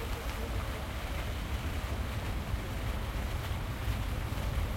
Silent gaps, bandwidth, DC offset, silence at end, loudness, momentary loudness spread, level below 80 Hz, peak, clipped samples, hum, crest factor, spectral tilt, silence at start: none; 16.5 kHz; under 0.1%; 0 s; -37 LUFS; 2 LU; -38 dBFS; -20 dBFS; under 0.1%; none; 14 dB; -5.5 dB/octave; 0 s